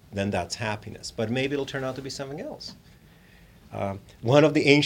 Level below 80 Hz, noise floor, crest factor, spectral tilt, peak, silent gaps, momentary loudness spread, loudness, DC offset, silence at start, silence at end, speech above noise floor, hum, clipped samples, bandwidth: -56 dBFS; -53 dBFS; 26 dB; -5.5 dB/octave; -2 dBFS; none; 18 LU; -26 LUFS; under 0.1%; 0.1 s; 0 s; 28 dB; none; under 0.1%; 16.5 kHz